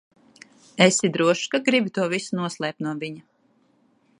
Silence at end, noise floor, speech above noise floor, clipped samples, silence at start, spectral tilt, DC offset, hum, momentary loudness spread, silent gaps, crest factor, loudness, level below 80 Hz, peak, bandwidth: 1 s; -63 dBFS; 41 dB; under 0.1%; 0.75 s; -4 dB/octave; under 0.1%; none; 15 LU; none; 24 dB; -22 LUFS; -72 dBFS; 0 dBFS; 11.5 kHz